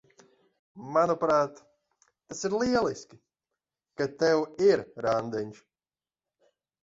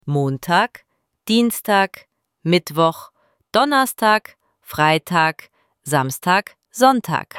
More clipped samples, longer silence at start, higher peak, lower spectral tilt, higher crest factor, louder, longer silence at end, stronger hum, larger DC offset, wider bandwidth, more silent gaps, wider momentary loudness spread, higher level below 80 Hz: neither; first, 0.75 s vs 0.05 s; second, -10 dBFS vs -2 dBFS; about the same, -5 dB/octave vs -4.5 dB/octave; about the same, 20 dB vs 18 dB; second, -27 LUFS vs -18 LUFS; first, 1.3 s vs 0 s; neither; neither; second, 7.8 kHz vs 17.5 kHz; neither; first, 17 LU vs 13 LU; about the same, -64 dBFS vs -62 dBFS